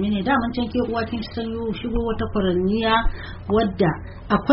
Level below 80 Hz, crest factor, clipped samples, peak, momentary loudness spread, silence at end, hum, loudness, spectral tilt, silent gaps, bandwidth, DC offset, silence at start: -32 dBFS; 18 dB; under 0.1%; -4 dBFS; 8 LU; 0 s; none; -23 LUFS; -5 dB/octave; none; 5.8 kHz; under 0.1%; 0 s